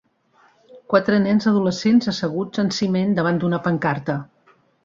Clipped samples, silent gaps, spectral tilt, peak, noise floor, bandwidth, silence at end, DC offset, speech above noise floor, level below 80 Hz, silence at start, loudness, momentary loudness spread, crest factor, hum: under 0.1%; none; -6.5 dB/octave; -2 dBFS; -58 dBFS; 7.6 kHz; 0.6 s; under 0.1%; 39 dB; -60 dBFS; 0.75 s; -20 LUFS; 7 LU; 18 dB; none